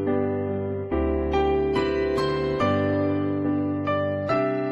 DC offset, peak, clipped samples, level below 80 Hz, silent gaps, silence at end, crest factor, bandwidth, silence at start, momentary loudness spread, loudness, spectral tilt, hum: under 0.1%; -10 dBFS; under 0.1%; -38 dBFS; none; 0 s; 14 dB; 8.2 kHz; 0 s; 4 LU; -24 LUFS; -8 dB/octave; none